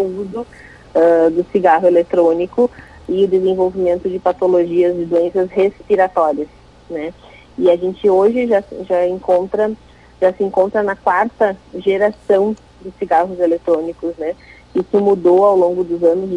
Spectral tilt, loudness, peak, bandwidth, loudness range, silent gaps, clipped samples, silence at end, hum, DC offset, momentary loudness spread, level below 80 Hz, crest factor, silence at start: -7.5 dB/octave; -15 LUFS; -2 dBFS; 9.2 kHz; 3 LU; none; under 0.1%; 0 s; none; under 0.1%; 13 LU; -48 dBFS; 14 dB; 0 s